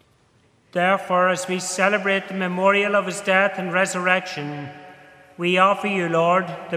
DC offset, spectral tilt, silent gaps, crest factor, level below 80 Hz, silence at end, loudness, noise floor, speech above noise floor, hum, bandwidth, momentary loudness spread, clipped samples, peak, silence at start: under 0.1%; -4 dB/octave; none; 20 dB; -72 dBFS; 0 s; -20 LUFS; -59 dBFS; 38 dB; none; 15 kHz; 10 LU; under 0.1%; -2 dBFS; 0.75 s